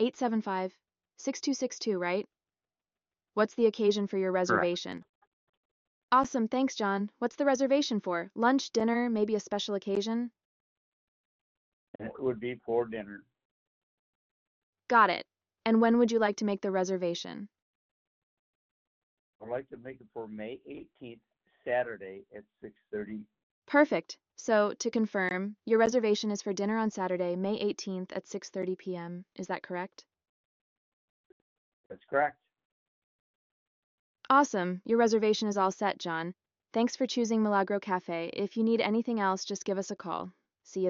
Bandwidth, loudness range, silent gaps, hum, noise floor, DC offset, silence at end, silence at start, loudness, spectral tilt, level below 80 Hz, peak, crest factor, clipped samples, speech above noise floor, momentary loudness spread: 7.6 kHz; 11 LU; 5.09-6.08 s, 10.45-11.99 s, 13.45-14.73 s, 17.62-19.39 s, 23.43-23.62 s, 30.29-31.90 s, 32.65-34.15 s; none; under -90 dBFS; under 0.1%; 0 s; 0 s; -30 LUFS; -4 dB/octave; -74 dBFS; -12 dBFS; 20 dB; under 0.1%; over 60 dB; 17 LU